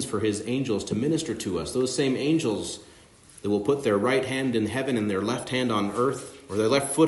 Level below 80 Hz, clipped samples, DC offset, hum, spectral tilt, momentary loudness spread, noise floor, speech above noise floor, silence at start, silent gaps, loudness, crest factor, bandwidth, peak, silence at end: -60 dBFS; under 0.1%; under 0.1%; none; -5 dB/octave; 6 LU; -52 dBFS; 26 dB; 0 s; none; -26 LUFS; 18 dB; 11.5 kHz; -8 dBFS; 0 s